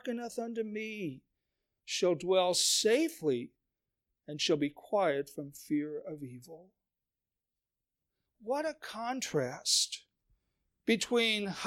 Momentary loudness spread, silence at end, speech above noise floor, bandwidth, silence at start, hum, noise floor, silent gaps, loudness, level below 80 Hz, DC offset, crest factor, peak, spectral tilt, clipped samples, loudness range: 17 LU; 0 s; over 57 dB; 17 kHz; 0.05 s; none; under -90 dBFS; none; -32 LUFS; -76 dBFS; under 0.1%; 20 dB; -14 dBFS; -2.5 dB/octave; under 0.1%; 11 LU